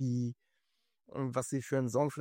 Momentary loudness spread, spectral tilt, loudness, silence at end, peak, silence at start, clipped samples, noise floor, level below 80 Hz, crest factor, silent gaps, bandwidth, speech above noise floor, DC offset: 12 LU; -7 dB/octave; -35 LUFS; 0 s; -18 dBFS; 0 s; under 0.1%; -83 dBFS; -74 dBFS; 18 dB; none; 16 kHz; 49 dB; under 0.1%